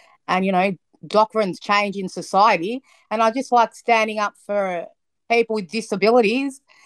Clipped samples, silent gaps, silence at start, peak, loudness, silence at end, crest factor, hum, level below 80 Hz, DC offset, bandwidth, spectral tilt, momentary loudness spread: under 0.1%; none; 0.3 s; -4 dBFS; -20 LUFS; 0.3 s; 16 dB; none; -72 dBFS; under 0.1%; 12.5 kHz; -5 dB/octave; 12 LU